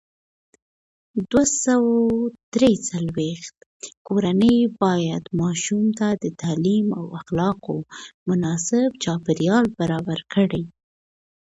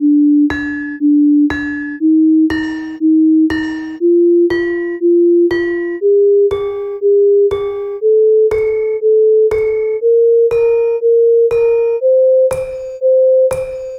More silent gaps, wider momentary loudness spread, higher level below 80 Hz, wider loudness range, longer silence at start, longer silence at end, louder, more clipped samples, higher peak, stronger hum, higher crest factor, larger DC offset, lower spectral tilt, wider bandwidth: first, 2.43-2.52 s, 3.57-3.80 s, 3.97-4.05 s, 8.14-8.26 s vs none; first, 12 LU vs 9 LU; second, -54 dBFS vs -44 dBFS; about the same, 2 LU vs 1 LU; first, 1.15 s vs 0 s; first, 0.85 s vs 0 s; second, -21 LUFS vs -12 LUFS; neither; about the same, -4 dBFS vs -6 dBFS; neither; first, 18 dB vs 6 dB; neither; second, -5.5 dB/octave vs -7 dB/octave; second, 8 kHz vs 11 kHz